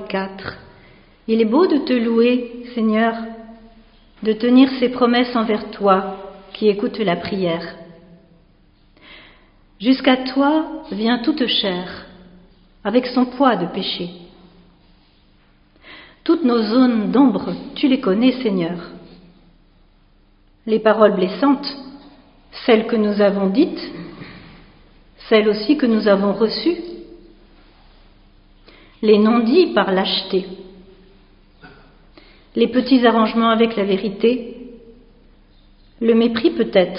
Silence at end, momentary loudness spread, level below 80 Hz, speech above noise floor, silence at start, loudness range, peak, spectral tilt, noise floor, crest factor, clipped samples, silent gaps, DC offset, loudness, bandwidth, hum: 0 s; 18 LU; -52 dBFS; 37 dB; 0 s; 5 LU; 0 dBFS; -4 dB/octave; -53 dBFS; 20 dB; under 0.1%; none; under 0.1%; -17 LUFS; 5.4 kHz; none